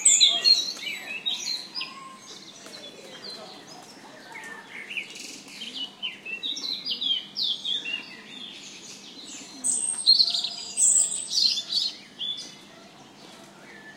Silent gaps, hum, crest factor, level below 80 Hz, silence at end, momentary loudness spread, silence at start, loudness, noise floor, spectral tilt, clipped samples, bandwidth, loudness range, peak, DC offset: none; none; 24 dB; -82 dBFS; 0 s; 24 LU; 0 s; -23 LUFS; -49 dBFS; 2 dB/octave; under 0.1%; 16 kHz; 16 LU; -4 dBFS; under 0.1%